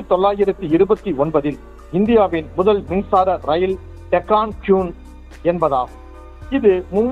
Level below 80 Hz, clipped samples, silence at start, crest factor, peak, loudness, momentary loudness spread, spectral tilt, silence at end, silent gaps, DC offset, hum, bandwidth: -38 dBFS; under 0.1%; 0 s; 16 dB; -2 dBFS; -18 LUFS; 8 LU; -8.5 dB/octave; 0 s; none; under 0.1%; none; 7 kHz